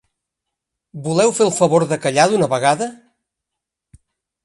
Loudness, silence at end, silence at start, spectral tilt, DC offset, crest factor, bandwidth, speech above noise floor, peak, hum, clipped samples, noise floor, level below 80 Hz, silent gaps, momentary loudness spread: -16 LUFS; 1.5 s; 0.95 s; -4.5 dB/octave; under 0.1%; 18 dB; 11.5 kHz; 66 dB; 0 dBFS; none; under 0.1%; -82 dBFS; -62 dBFS; none; 7 LU